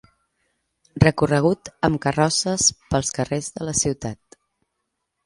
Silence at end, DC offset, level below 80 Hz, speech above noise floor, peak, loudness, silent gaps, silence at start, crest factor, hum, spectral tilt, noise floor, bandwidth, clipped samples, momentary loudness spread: 1.1 s; under 0.1%; -44 dBFS; 56 dB; 0 dBFS; -21 LUFS; none; 0.95 s; 22 dB; none; -4 dB/octave; -77 dBFS; 11.5 kHz; under 0.1%; 11 LU